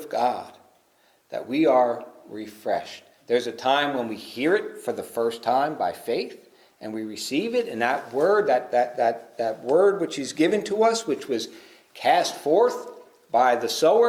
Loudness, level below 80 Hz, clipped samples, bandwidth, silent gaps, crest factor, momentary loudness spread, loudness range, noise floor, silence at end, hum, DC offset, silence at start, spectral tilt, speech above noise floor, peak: -24 LUFS; -74 dBFS; under 0.1%; 16 kHz; none; 18 dB; 15 LU; 4 LU; -62 dBFS; 0 s; none; under 0.1%; 0 s; -4 dB/octave; 39 dB; -6 dBFS